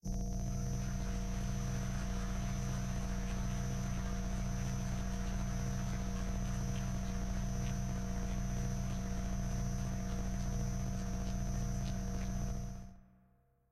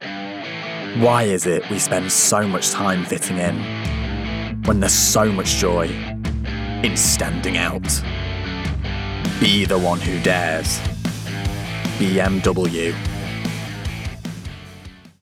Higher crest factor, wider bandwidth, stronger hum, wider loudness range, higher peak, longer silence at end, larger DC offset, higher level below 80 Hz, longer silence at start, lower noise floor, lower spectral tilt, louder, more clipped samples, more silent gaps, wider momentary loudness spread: second, 10 dB vs 18 dB; second, 13.5 kHz vs 18 kHz; neither; second, 0 LU vs 4 LU; second, -26 dBFS vs -4 dBFS; first, 0.7 s vs 0.15 s; neither; second, -40 dBFS vs -32 dBFS; about the same, 0.05 s vs 0 s; first, -70 dBFS vs -41 dBFS; first, -6 dB/octave vs -3.5 dB/octave; second, -40 LUFS vs -20 LUFS; neither; neither; second, 1 LU vs 12 LU